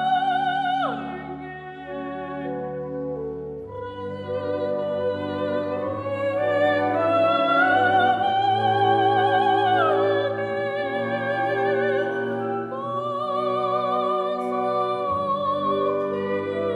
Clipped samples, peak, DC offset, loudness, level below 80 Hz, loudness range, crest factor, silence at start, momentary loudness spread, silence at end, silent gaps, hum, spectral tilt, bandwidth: under 0.1%; -8 dBFS; under 0.1%; -23 LUFS; -60 dBFS; 10 LU; 14 dB; 0 s; 13 LU; 0 s; none; none; -7 dB/octave; 10 kHz